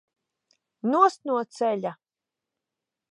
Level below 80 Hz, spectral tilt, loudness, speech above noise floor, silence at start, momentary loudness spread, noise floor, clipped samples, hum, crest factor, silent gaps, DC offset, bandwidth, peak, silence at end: -88 dBFS; -5.5 dB/octave; -25 LUFS; 65 dB; 0.85 s; 11 LU; -88 dBFS; under 0.1%; none; 22 dB; none; under 0.1%; 11.5 kHz; -6 dBFS; 1.2 s